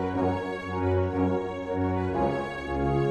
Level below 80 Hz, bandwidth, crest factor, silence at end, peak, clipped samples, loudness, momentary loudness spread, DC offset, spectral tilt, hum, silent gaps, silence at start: -44 dBFS; 8.8 kHz; 14 dB; 0 s; -14 dBFS; under 0.1%; -28 LUFS; 5 LU; under 0.1%; -8.5 dB/octave; none; none; 0 s